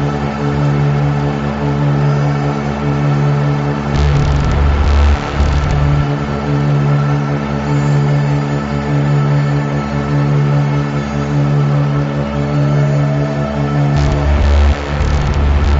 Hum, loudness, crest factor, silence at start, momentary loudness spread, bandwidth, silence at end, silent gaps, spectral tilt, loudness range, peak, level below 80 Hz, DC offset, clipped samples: none; -14 LUFS; 10 dB; 0 s; 4 LU; 7.6 kHz; 0 s; none; -7 dB/octave; 1 LU; -2 dBFS; -20 dBFS; under 0.1%; under 0.1%